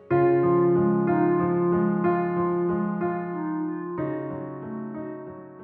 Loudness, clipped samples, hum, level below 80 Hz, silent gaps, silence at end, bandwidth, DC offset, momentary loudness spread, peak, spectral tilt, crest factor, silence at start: -25 LUFS; under 0.1%; none; -62 dBFS; none; 0 s; 3.2 kHz; under 0.1%; 14 LU; -10 dBFS; -10 dB/octave; 14 dB; 0 s